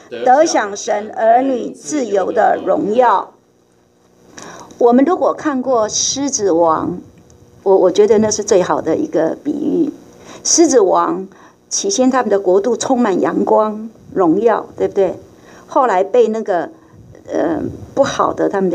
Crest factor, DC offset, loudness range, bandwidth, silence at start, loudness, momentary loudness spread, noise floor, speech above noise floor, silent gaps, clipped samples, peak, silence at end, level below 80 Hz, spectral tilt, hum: 14 dB; under 0.1%; 3 LU; 12 kHz; 0.1 s; -15 LUFS; 10 LU; -53 dBFS; 39 dB; none; under 0.1%; 0 dBFS; 0 s; -54 dBFS; -3.5 dB/octave; none